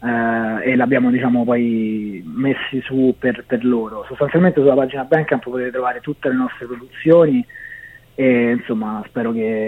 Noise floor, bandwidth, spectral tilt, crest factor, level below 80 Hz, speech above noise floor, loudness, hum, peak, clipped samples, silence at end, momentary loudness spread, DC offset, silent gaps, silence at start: -39 dBFS; 4 kHz; -9 dB/octave; 16 dB; -54 dBFS; 22 dB; -18 LUFS; none; 0 dBFS; under 0.1%; 0 s; 11 LU; under 0.1%; none; 0 s